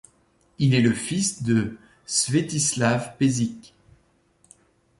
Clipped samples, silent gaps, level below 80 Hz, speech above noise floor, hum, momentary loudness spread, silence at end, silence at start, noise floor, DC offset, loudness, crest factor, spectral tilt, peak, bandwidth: under 0.1%; none; -56 dBFS; 40 dB; none; 9 LU; 1.35 s; 0.6 s; -63 dBFS; under 0.1%; -23 LUFS; 18 dB; -4.5 dB/octave; -6 dBFS; 11.5 kHz